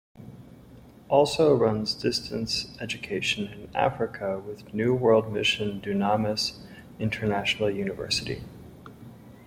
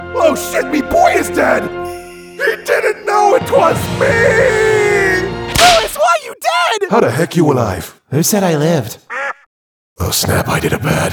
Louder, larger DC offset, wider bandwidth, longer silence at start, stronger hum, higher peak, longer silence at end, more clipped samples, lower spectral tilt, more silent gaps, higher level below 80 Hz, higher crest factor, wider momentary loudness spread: second, -26 LUFS vs -13 LUFS; neither; second, 16 kHz vs over 20 kHz; first, 0.15 s vs 0 s; neither; second, -8 dBFS vs 0 dBFS; about the same, 0 s vs 0 s; neither; about the same, -4.5 dB/octave vs -4 dB/octave; second, none vs 9.46-9.96 s; second, -54 dBFS vs -38 dBFS; first, 20 dB vs 14 dB; first, 22 LU vs 11 LU